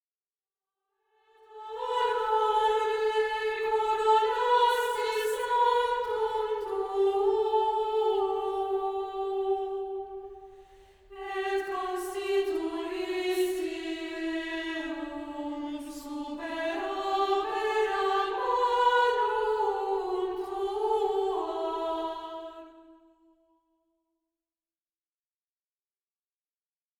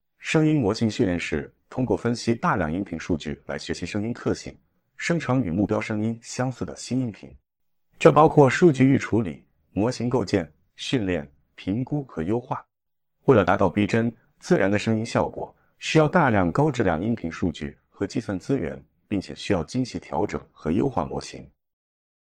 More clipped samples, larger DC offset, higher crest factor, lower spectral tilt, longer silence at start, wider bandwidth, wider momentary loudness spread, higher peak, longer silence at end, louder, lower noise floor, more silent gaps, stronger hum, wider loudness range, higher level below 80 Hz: neither; neither; second, 18 dB vs 24 dB; second, -2.5 dB/octave vs -6.5 dB/octave; first, 1.5 s vs 0.2 s; first, 19.5 kHz vs 10 kHz; second, 12 LU vs 15 LU; second, -12 dBFS vs -2 dBFS; first, 4.05 s vs 0.85 s; second, -29 LUFS vs -24 LUFS; first, under -90 dBFS vs -83 dBFS; neither; neither; about the same, 8 LU vs 7 LU; second, -62 dBFS vs -50 dBFS